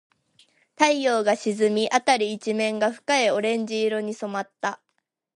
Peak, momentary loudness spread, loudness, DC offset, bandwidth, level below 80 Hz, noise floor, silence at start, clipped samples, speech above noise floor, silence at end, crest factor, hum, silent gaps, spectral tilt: -2 dBFS; 10 LU; -23 LUFS; under 0.1%; 11.5 kHz; -78 dBFS; -76 dBFS; 0.8 s; under 0.1%; 53 dB; 0.65 s; 22 dB; none; none; -3.5 dB/octave